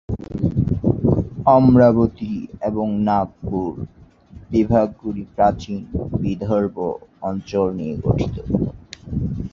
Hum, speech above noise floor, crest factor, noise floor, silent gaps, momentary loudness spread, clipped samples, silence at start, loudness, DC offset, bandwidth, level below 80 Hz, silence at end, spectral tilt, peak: none; 24 dB; 18 dB; -43 dBFS; none; 14 LU; under 0.1%; 0.1 s; -20 LUFS; under 0.1%; 7.2 kHz; -36 dBFS; 0.05 s; -9.5 dB/octave; -2 dBFS